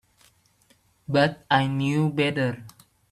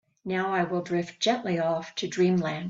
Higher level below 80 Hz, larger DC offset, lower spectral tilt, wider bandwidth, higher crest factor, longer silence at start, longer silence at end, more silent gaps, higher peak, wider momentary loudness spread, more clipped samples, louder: first, -62 dBFS vs -68 dBFS; neither; about the same, -6.5 dB/octave vs -5.5 dB/octave; first, 13.5 kHz vs 7.8 kHz; about the same, 20 dB vs 16 dB; first, 1.1 s vs 0.25 s; first, 0.4 s vs 0 s; neither; first, -6 dBFS vs -12 dBFS; first, 9 LU vs 6 LU; neither; first, -24 LUFS vs -27 LUFS